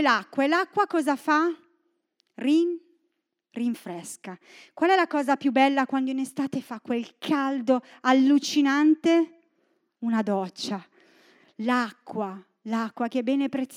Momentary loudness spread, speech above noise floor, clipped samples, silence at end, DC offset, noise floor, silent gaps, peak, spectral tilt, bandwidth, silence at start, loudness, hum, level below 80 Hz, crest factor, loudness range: 14 LU; 52 dB; under 0.1%; 0 s; under 0.1%; -77 dBFS; none; -6 dBFS; -4.5 dB/octave; 15 kHz; 0 s; -25 LUFS; none; -84 dBFS; 20 dB; 7 LU